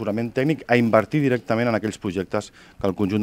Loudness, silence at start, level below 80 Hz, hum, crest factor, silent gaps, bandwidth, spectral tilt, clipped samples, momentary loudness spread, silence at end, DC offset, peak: -22 LUFS; 0 s; -56 dBFS; none; 20 dB; none; 16 kHz; -7 dB/octave; under 0.1%; 10 LU; 0 s; under 0.1%; -2 dBFS